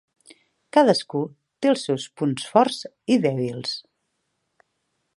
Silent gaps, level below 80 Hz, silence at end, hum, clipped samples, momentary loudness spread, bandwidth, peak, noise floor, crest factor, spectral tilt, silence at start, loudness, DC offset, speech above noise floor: none; -72 dBFS; 1.4 s; none; under 0.1%; 12 LU; 11.5 kHz; -2 dBFS; -75 dBFS; 22 dB; -5.5 dB/octave; 0.75 s; -23 LUFS; under 0.1%; 53 dB